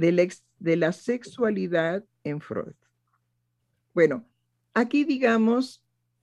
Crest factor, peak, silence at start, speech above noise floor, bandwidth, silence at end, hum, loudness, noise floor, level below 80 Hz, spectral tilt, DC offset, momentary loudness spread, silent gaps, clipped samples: 18 dB; -8 dBFS; 0 s; 51 dB; 11.5 kHz; 0.5 s; 60 Hz at -60 dBFS; -26 LUFS; -75 dBFS; -72 dBFS; -6.5 dB/octave; under 0.1%; 12 LU; none; under 0.1%